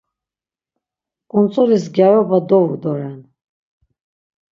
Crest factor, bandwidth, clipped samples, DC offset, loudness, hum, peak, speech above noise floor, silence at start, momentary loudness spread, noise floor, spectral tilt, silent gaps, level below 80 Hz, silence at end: 18 dB; 7.4 kHz; under 0.1%; under 0.1%; -15 LUFS; none; 0 dBFS; over 76 dB; 1.35 s; 11 LU; under -90 dBFS; -8.5 dB/octave; none; -66 dBFS; 1.3 s